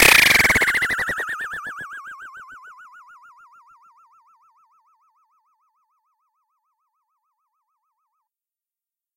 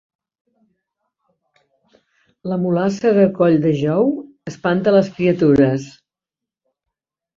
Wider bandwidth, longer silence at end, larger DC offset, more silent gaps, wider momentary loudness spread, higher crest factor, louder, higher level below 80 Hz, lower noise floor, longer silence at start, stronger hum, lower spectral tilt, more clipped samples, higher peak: first, 17 kHz vs 7.6 kHz; first, 6.45 s vs 1.45 s; neither; neither; first, 28 LU vs 12 LU; first, 24 dB vs 16 dB; about the same, -16 LUFS vs -17 LUFS; first, -48 dBFS vs -54 dBFS; first, under -90 dBFS vs -86 dBFS; second, 0 s vs 2.45 s; neither; second, -1 dB/octave vs -8 dB/octave; neither; about the same, 0 dBFS vs -2 dBFS